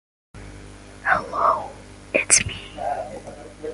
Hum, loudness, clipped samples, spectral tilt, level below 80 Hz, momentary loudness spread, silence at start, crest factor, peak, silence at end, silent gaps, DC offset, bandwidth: 50 Hz at -45 dBFS; -21 LUFS; under 0.1%; -1.5 dB/octave; -46 dBFS; 26 LU; 0.35 s; 26 dB; 0 dBFS; 0 s; none; under 0.1%; 11.5 kHz